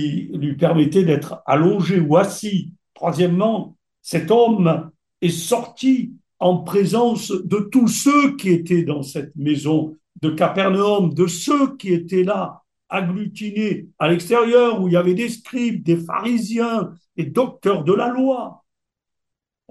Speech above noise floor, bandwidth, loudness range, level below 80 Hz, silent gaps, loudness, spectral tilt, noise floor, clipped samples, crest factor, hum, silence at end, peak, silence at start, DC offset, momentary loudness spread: 64 dB; 12.5 kHz; 3 LU; -64 dBFS; none; -19 LUFS; -6 dB/octave; -82 dBFS; under 0.1%; 18 dB; none; 1.15 s; -2 dBFS; 0 s; under 0.1%; 10 LU